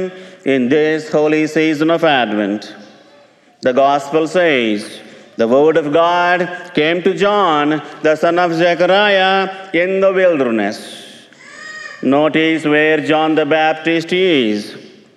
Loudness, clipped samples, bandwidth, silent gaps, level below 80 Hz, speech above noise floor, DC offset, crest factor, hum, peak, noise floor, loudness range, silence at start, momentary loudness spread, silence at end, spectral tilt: -14 LUFS; under 0.1%; 12 kHz; none; -66 dBFS; 33 dB; under 0.1%; 12 dB; none; -2 dBFS; -47 dBFS; 3 LU; 0 s; 12 LU; 0.3 s; -5.5 dB/octave